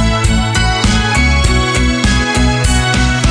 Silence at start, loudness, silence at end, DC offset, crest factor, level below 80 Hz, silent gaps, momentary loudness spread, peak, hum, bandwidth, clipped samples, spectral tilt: 0 s; -12 LUFS; 0 s; under 0.1%; 10 dB; -16 dBFS; none; 2 LU; 0 dBFS; none; 10.5 kHz; under 0.1%; -4 dB/octave